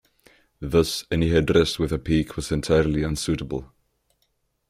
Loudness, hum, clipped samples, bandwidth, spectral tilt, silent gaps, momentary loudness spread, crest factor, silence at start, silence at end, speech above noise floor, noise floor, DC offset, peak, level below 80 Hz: -23 LUFS; none; under 0.1%; 15.5 kHz; -5.5 dB/octave; none; 8 LU; 18 dB; 0.6 s; 1.05 s; 49 dB; -71 dBFS; under 0.1%; -6 dBFS; -40 dBFS